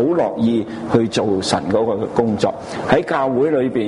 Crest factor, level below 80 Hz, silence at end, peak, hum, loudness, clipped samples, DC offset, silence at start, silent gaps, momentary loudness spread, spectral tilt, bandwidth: 16 dB; -48 dBFS; 0 s; -2 dBFS; none; -18 LUFS; under 0.1%; under 0.1%; 0 s; none; 3 LU; -6 dB/octave; 11 kHz